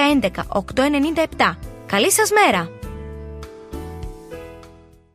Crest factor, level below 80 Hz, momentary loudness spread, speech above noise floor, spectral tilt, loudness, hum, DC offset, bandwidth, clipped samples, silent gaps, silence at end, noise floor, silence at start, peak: 18 dB; -40 dBFS; 21 LU; 28 dB; -3.5 dB/octave; -18 LUFS; none; under 0.1%; 15 kHz; under 0.1%; none; 0.45 s; -46 dBFS; 0 s; -2 dBFS